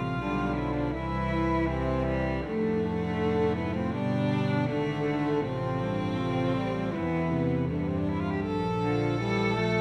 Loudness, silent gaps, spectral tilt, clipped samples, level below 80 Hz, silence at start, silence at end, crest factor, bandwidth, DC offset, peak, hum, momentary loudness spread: -29 LUFS; none; -8 dB/octave; under 0.1%; -44 dBFS; 0 s; 0 s; 14 dB; 9.4 kHz; under 0.1%; -14 dBFS; none; 3 LU